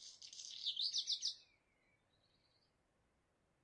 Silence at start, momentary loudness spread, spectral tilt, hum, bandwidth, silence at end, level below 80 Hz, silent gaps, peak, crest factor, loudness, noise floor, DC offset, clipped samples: 0 s; 15 LU; 3 dB/octave; none; 11 kHz; 2.2 s; -90 dBFS; none; -28 dBFS; 20 dB; -40 LUFS; -81 dBFS; under 0.1%; under 0.1%